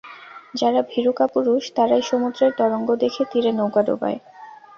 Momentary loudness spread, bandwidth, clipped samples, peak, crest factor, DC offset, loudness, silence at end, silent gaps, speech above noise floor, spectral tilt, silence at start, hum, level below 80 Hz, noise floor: 8 LU; 7.2 kHz; under 0.1%; -4 dBFS; 16 dB; under 0.1%; -20 LUFS; 0.25 s; none; 21 dB; -5.5 dB/octave; 0.05 s; none; -66 dBFS; -41 dBFS